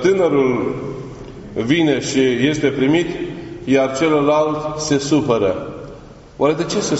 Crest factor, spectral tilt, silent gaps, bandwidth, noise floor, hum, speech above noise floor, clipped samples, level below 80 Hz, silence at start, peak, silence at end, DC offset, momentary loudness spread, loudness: 16 dB; -5 dB/octave; none; 8 kHz; -38 dBFS; none; 22 dB; under 0.1%; -46 dBFS; 0 s; -2 dBFS; 0 s; under 0.1%; 14 LU; -17 LUFS